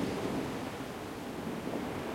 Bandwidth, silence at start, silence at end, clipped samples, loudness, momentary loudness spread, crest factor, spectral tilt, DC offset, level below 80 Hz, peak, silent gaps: 16.5 kHz; 0 s; 0 s; under 0.1%; -38 LUFS; 6 LU; 16 dB; -5.5 dB/octave; under 0.1%; -58 dBFS; -20 dBFS; none